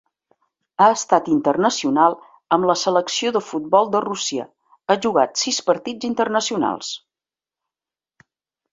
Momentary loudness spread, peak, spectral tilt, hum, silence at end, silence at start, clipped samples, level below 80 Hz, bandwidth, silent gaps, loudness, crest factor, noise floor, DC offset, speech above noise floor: 12 LU; -2 dBFS; -3.5 dB/octave; none; 1.75 s; 0.8 s; under 0.1%; -66 dBFS; 8 kHz; none; -19 LUFS; 20 dB; under -90 dBFS; under 0.1%; over 71 dB